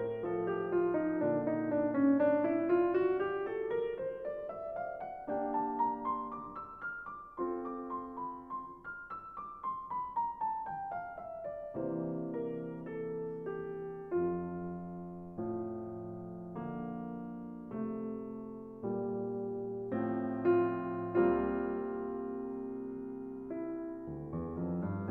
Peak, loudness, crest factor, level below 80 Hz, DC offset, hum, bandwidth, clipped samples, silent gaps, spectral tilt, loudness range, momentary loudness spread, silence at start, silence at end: -16 dBFS; -37 LUFS; 20 dB; -64 dBFS; under 0.1%; none; 3.8 kHz; under 0.1%; none; -10.5 dB/octave; 10 LU; 13 LU; 0 s; 0 s